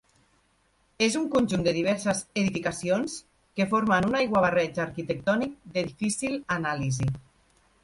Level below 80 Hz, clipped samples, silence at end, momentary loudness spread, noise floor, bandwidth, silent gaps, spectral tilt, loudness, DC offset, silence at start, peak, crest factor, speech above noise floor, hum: -56 dBFS; under 0.1%; 0.65 s; 8 LU; -67 dBFS; 11.5 kHz; none; -5 dB/octave; -27 LUFS; under 0.1%; 1 s; -10 dBFS; 18 dB; 41 dB; none